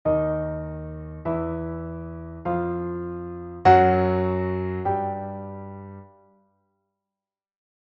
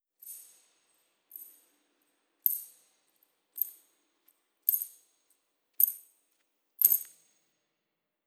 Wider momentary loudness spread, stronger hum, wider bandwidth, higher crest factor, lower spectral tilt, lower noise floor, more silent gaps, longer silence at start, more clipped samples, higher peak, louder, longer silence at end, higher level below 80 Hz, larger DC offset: second, 19 LU vs 24 LU; neither; second, 7.4 kHz vs over 20 kHz; second, 22 dB vs 34 dB; first, -7 dB/octave vs 2 dB/octave; first, under -90 dBFS vs -85 dBFS; neither; second, 0.05 s vs 0.25 s; neither; about the same, -4 dBFS vs -4 dBFS; first, -24 LUFS vs -28 LUFS; first, 1.8 s vs 1.2 s; first, -46 dBFS vs under -90 dBFS; neither